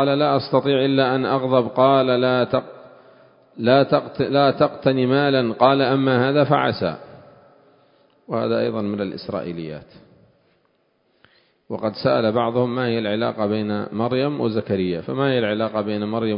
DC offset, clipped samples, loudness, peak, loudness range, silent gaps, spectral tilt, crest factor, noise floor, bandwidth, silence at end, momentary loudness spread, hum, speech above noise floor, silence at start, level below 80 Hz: under 0.1%; under 0.1%; -20 LUFS; 0 dBFS; 9 LU; none; -11.5 dB/octave; 20 dB; -65 dBFS; 5.4 kHz; 0 s; 10 LU; none; 45 dB; 0 s; -58 dBFS